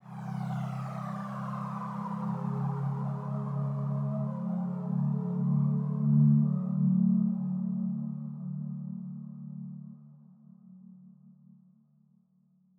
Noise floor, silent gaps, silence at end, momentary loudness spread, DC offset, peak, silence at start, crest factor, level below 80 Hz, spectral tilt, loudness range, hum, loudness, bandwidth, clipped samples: -67 dBFS; none; 1.5 s; 15 LU; under 0.1%; -14 dBFS; 0.05 s; 16 dB; -78 dBFS; -11 dB/octave; 17 LU; none; -31 LUFS; 3.4 kHz; under 0.1%